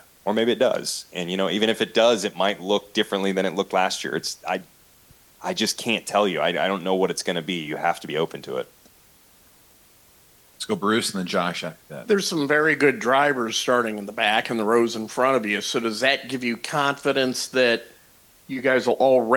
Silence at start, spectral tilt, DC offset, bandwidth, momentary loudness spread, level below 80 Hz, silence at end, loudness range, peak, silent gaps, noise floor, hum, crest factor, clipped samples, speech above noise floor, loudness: 0.25 s; -3.5 dB/octave; under 0.1%; 19 kHz; 9 LU; -68 dBFS; 0 s; 7 LU; -6 dBFS; none; -55 dBFS; none; 18 dB; under 0.1%; 32 dB; -23 LUFS